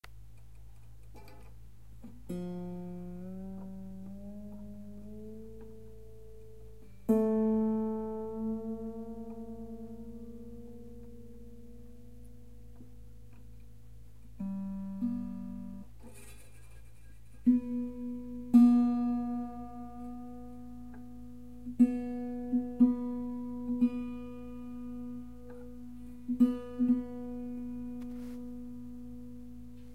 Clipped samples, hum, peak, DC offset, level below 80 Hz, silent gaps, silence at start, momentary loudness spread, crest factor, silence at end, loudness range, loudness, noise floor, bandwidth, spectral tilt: under 0.1%; none; -12 dBFS; 0.4%; -56 dBFS; none; 0 s; 26 LU; 22 dB; 0 s; 18 LU; -33 LUFS; -55 dBFS; 10 kHz; -9 dB/octave